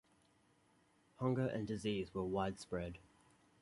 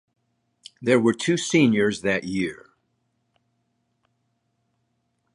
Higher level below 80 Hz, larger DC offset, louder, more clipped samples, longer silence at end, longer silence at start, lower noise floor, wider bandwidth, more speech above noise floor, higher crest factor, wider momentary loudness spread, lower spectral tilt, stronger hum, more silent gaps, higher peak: about the same, -64 dBFS vs -62 dBFS; neither; second, -41 LUFS vs -22 LUFS; neither; second, 0.6 s vs 2.8 s; first, 1.2 s vs 0.8 s; about the same, -73 dBFS vs -73 dBFS; about the same, 11.5 kHz vs 11.5 kHz; second, 33 dB vs 52 dB; about the same, 20 dB vs 20 dB; about the same, 7 LU vs 9 LU; first, -6.5 dB/octave vs -5 dB/octave; neither; neither; second, -24 dBFS vs -6 dBFS